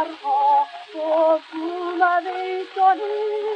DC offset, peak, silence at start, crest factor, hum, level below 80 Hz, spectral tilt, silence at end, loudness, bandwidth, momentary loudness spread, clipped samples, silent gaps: under 0.1%; -6 dBFS; 0 s; 14 dB; none; -86 dBFS; -3 dB/octave; 0 s; -21 LUFS; 8.8 kHz; 9 LU; under 0.1%; none